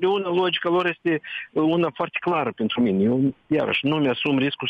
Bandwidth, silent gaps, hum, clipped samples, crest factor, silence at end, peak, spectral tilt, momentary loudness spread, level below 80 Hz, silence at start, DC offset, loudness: 5.6 kHz; none; none; under 0.1%; 12 dB; 0 s; -10 dBFS; -8 dB/octave; 4 LU; -64 dBFS; 0 s; under 0.1%; -22 LUFS